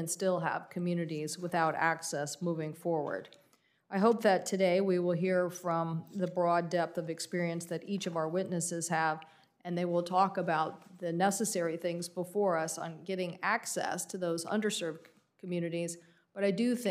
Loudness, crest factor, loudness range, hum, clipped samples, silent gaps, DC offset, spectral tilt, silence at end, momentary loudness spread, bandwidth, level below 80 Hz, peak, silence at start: -33 LUFS; 18 dB; 4 LU; none; under 0.1%; none; under 0.1%; -5 dB/octave; 0 s; 9 LU; 15.5 kHz; -88 dBFS; -14 dBFS; 0 s